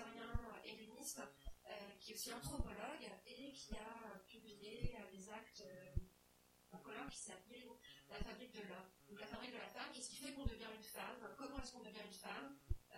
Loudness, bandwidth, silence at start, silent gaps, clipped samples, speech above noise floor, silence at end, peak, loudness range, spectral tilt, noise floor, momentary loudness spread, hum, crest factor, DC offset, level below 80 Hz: -53 LUFS; 16.5 kHz; 0 s; none; under 0.1%; 21 dB; 0 s; -28 dBFS; 4 LU; -4 dB/octave; -73 dBFS; 9 LU; none; 24 dB; under 0.1%; -58 dBFS